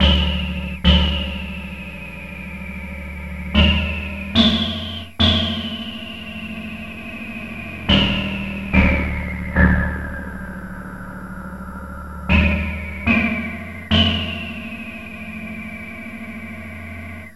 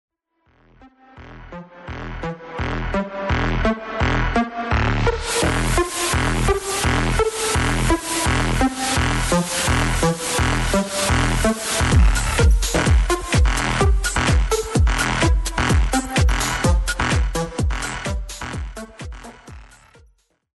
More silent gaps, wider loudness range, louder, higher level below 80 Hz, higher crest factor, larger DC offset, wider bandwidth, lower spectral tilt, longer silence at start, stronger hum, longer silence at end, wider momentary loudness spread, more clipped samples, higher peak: neither; about the same, 5 LU vs 7 LU; about the same, -20 LUFS vs -20 LUFS; about the same, -28 dBFS vs -24 dBFS; about the same, 20 dB vs 16 dB; first, 0.5% vs under 0.1%; about the same, 12 kHz vs 12.5 kHz; first, -6 dB/octave vs -4.5 dB/octave; second, 0 s vs 0.85 s; neither; second, 0.05 s vs 0.9 s; first, 16 LU vs 12 LU; neither; first, 0 dBFS vs -4 dBFS